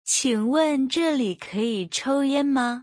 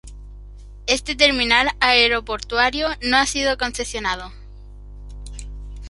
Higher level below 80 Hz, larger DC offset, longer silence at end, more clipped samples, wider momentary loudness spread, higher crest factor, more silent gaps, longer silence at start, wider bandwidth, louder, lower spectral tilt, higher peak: second, -68 dBFS vs -36 dBFS; neither; about the same, 0 s vs 0 s; neither; second, 5 LU vs 22 LU; second, 14 dB vs 20 dB; neither; about the same, 0.05 s vs 0.05 s; about the same, 10.5 kHz vs 11.5 kHz; second, -23 LUFS vs -18 LUFS; about the same, -3 dB/octave vs -2 dB/octave; second, -10 dBFS vs 0 dBFS